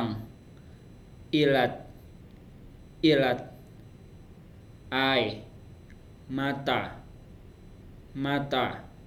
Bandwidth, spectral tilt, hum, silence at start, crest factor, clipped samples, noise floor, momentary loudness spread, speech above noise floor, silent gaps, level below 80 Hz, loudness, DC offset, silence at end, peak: 14.5 kHz; -6.5 dB/octave; none; 0 s; 22 dB; under 0.1%; -50 dBFS; 27 LU; 23 dB; none; -54 dBFS; -28 LUFS; under 0.1%; 0 s; -10 dBFS